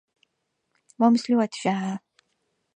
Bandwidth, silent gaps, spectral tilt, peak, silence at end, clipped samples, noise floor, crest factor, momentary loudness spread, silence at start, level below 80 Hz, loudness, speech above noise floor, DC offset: 9.4 kHz; none; -6 dB/octave; -8 dBFS; 0.8 s; under 0.1%; -77 dBFS; 20 dB; 11 LU; 1 s; -78 dBFS; -23 LUFS; 55 dB; under 0.1%